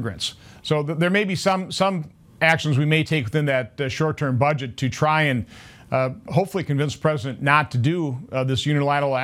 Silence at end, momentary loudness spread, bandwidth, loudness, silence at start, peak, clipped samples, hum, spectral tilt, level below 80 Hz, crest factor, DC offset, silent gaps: 0 s; 8 LU; 15 kHz; -22 LUFS; 0 s; -2 dBFS; under 0.1%; none; -6 dB/octave; -56 dBFS; 20 dB; under 0.1%; none